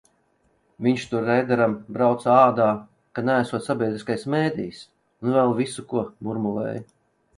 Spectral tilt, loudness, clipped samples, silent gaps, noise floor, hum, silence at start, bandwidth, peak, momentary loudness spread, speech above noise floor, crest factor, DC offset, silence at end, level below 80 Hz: -6.5 dB/octave; -23 LUFS; under 0.1%; none; -66 dBFS; none; 0.8 s; 11.5 kHz; -2 dBFS; 12 LU; 44 dB; 20 dB; under 0.1%; 0.55 s; -64 dBFS